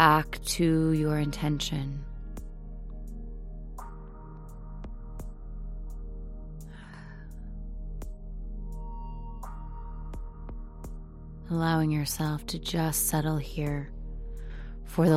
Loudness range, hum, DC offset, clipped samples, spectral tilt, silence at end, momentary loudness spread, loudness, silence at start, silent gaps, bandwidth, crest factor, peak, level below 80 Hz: 15 LU; none; under 0.1%; under 0.1%; -5 dB/octave; 0 s; 19 LU; -30 LUFS; 0 s; none; 16 kHz; 26 dB; -4 dBFS; -40 dBFS